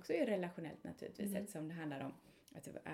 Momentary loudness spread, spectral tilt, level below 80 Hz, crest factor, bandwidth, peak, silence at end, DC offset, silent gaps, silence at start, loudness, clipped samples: 16 LU; -6 dB/octave; -78 dBFS; 18 dB; 17 kHz; -26 dBFS; 0 s; under 0.1%; none; 0 s; -44 LUFS; under 0.1%